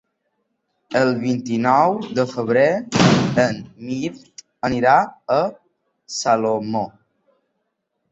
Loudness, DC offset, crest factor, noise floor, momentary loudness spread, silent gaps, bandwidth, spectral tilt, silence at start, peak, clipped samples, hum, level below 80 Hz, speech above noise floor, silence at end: -19 LUFS; under 0.1%; 18 dB; -74 dBFS; 11 LU; none; 8.2 kHz; -5.5 dB/octave; 0.9 s; -2 dBFS; under 0.1%; none; -54 dBFS; 55 dB; 1.25 s